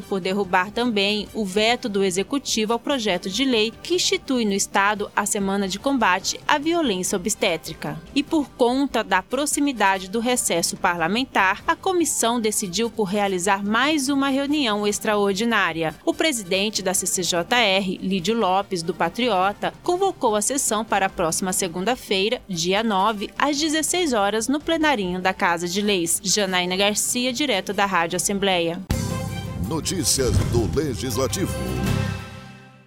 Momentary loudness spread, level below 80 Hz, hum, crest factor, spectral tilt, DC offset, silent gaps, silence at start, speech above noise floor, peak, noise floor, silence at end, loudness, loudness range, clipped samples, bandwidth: 5 LU; -42 dBFS; none; 22 dB; -3 dB/octave; 0.1%; none; 0 s; 20 dB; 0 dBFS; -42 dBFS; 0.2 s; -21 LUFS; 2 LU; under 0.1%; 18 kHz